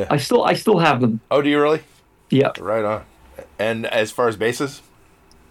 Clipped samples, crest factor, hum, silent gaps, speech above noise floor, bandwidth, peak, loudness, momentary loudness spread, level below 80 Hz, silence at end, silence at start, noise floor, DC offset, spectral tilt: under 0.1%; 14 dB; none; none; 33 dB; 17.5 kHz; -6 dBFS; -19 LUFS; 9 LU; -56 dBFS; 0.7 s; 0 s; -52 dBFS; under 0.1%; -5.5 dB/octave